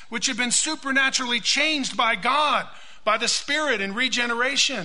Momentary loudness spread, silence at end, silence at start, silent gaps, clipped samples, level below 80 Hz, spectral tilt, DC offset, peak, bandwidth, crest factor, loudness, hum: 4 LU; 0 s; 0 s; none; under 0.1%; -60 dBFS; -0.5 dB/octave; 1%; -4 dBFS; 11 kHz; 18 dB; -21 LUFS; none